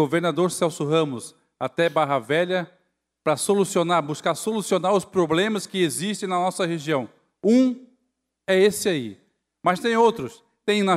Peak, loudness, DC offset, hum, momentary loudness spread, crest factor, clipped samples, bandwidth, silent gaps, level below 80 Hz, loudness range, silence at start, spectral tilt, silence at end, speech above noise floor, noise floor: -6 dBFS; -23 LUFS; under 0.1%; none; 12 LU; 16 dB; under 0.1%; 15.5 kHz; none; -68 dBFS; 1 LU; 0 s; -4.5 dB/octave; 0 s; 54 dB; -76 dBFS